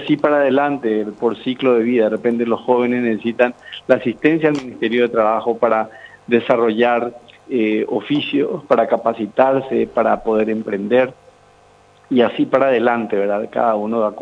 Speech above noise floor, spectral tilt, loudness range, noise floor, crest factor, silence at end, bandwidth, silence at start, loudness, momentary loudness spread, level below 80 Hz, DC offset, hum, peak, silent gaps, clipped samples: 33 dB; -7 dB/octave; 1 LU; -50 dBFS; 18 dB; 0 s; 8 kHz; 0 s; -17 LUFS; 5 LU; -58 dBFS; under 0.1%; none; 0 dBFS; none; under 0.1%